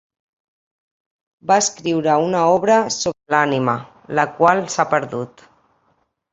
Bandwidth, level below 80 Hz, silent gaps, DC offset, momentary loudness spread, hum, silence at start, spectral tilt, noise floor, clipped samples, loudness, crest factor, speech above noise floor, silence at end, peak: 8.4 kHz; -60 dBFS; none; under 0.1%; 11 LU; none; 1.45 s; -4 dB/octave; -65 dBFS; under 0.1%; -18 LUFS; 18 dB; 47 dB; 1.05 s; -2 dBFS